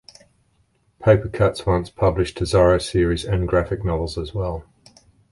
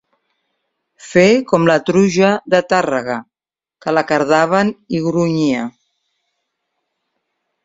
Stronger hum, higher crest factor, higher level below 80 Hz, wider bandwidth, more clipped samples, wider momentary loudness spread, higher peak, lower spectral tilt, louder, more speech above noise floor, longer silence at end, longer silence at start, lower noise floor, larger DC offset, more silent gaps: neither; about the same, 18 dB vs 16 dB; first, -34 dBFS vs -56 dBFS; first, 11.5 kHz vs 7.8 kHz; neither; about the same, 10 LU vs 9 LU; about the same, -2 dBFS vs 0 dBFS; about the same, -6.5 dB/octave vs -6 dB/octave; second, -20 LUFS vs -15 LUFS; second, 44 dB vs over 76 dB; second, 0.7 s vs 1.95 s; about the same, 1 s vs 1.05 s; second, -63 dBFS vs under -90 dBFS; neither; neither